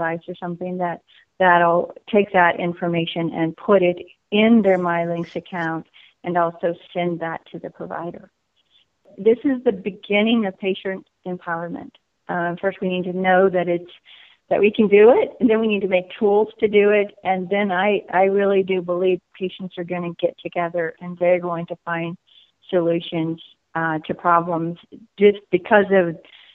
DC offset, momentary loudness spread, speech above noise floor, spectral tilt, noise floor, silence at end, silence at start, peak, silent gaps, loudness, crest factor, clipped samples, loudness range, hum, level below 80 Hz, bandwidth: under 0.1%; 15 LU; 42 dB; -9 dB/octave; -62 dBFS; 0.4 s; 0 s; -2 dBFS; none; -20 LUFS; 18 dB; under 0.1%; 7 LU; none; -62 dBFS; 4 kHz